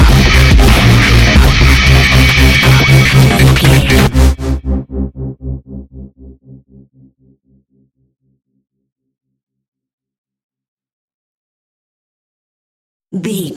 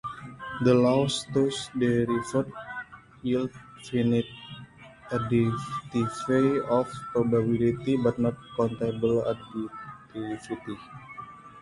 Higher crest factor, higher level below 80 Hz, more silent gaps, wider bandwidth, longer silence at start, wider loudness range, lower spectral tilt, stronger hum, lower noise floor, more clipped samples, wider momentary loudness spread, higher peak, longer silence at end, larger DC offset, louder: second, 12 dB vs 18 dB; first, -16 dBFS vs -56 dBFS; first, 8.92-8.96 s, 9.68-9.72 s, 9.93-9.98 s, 10.18-10.24 s, 10.44-10.49 s, 10.68-10.77 s, 10.93-11.08 s, 11.14-13.00 s vs none; first, 17 kHz vs 11.5 kHz; about the same, 0 s vs 0.05 s; first, 21 LU vs 5 LU; second, -5 dB/octave vs -6.5 dB/octave; neither; first, -56 dBFS vs -48 dBFS; neither; about the same, 16 LU vs 17 LU; first, 0 dBFS vs -10 dBFS; about the same, 0 s vs 0 s; neither; first, -8 LUFS vs -27 LUFS